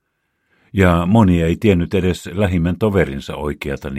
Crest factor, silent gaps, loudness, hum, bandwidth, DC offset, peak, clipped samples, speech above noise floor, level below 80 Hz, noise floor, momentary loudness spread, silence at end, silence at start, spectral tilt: 16 dB; none; -17 LUFS; none; 14.5 kHz; under 0.1%; 0 dBFS; under 0.1%; 53 dB; -34 dBFS; -69 dBFS; 12 LU; 0 s; 0.75 s; -7.5 dB/octave